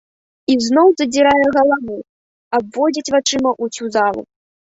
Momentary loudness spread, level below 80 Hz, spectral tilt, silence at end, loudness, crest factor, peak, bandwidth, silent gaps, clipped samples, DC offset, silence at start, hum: 11 LU; -54 dBFS; -3 dB/octave; 0.55 s; -15 LUFS; 16 dB; -2 dBFS; 8 kHz; 2.09-2.51 s; under 0.1%; under 0.1%; 0.5 s; none